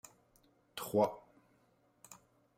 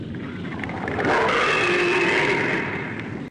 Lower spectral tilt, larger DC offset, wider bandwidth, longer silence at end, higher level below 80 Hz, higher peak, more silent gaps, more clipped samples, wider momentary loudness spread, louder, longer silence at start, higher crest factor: about the same, -5.5 dB/octave vs -5 dB/octave; neither; first, 16 kHz vs 10.5 kHz; first, 0.45 s vs 0 s; second, -78 dBFS vs -50 dBFS; second, -18 dBFS vs -10 dBFS; neither; neither; first, 25 LU vs 13 LU; second, -36 LUFS vs -21 LUFS; first, 0.75 s vs 0 s; first, 24 dB vs 12 dB